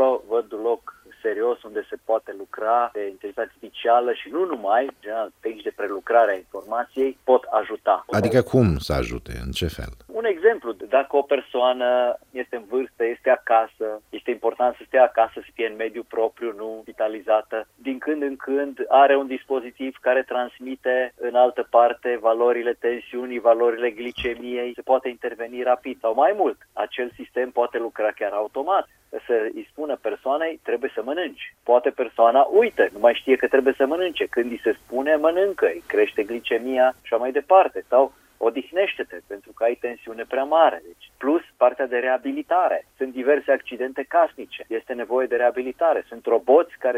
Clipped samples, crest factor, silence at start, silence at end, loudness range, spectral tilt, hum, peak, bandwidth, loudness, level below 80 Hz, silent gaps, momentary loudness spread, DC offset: under 0.1%; 18 dB; 0 s; 0 s; 5 LU; -6.5 dB/octave; none; -4 dBFS; 15.5 kHz; -22 LUFS; -48 dBFS; none; 12 LU; under 0.1%